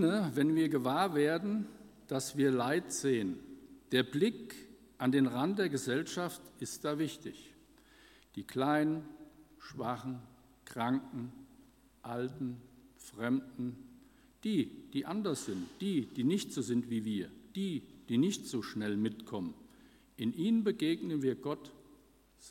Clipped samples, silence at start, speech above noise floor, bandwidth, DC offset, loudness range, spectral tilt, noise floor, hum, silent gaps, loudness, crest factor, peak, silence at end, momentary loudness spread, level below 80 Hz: under 0.1%; 0 s; 30 dB; 16.5 kHz; under 0.1%; 7 LU; -5.5 dB/octave; -64 dBFS; none; none; -35 LUFS; 22 dB; -14 dBFS; 0 s; 17 LU; -70 dBFS